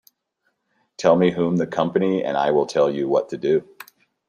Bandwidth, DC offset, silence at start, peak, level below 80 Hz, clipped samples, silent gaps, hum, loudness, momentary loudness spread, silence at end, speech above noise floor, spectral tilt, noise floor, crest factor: 14.5 kHz; under 0.1%; 1 s; -2 dBFS; -64 dBFS; under 0.1%; none; none; -20 LUFS; 5 LU; 0.65 s; 53 dB; -6.5 dB/octave; -72 dBFS; 20 dB